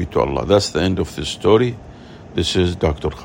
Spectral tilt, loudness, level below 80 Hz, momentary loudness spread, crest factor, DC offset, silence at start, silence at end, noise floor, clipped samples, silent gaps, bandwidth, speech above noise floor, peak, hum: -5.5 dB/octave; -18 LUFS; -36 dBFS; 8 LU; 18 dB; under 0.1%; 0 s; 0 s; -38 dBFS; under 0.1%; none; 16.5 kHz; 20 dB; 0 dBFS; none